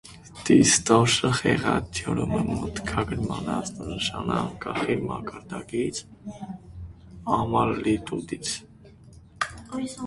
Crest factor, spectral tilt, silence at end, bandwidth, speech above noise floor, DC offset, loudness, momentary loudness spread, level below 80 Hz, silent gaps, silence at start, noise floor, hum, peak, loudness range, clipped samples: 22 dB; -4 dB/octave; 0 s; 11.5 kHz; 24 dB; under 0.1%; -25 LUFS; 19 LU; -46 dBFS; none; 0.05 s; -49 dBFS; none; -4 dBFS; 8 LU; under 0.1%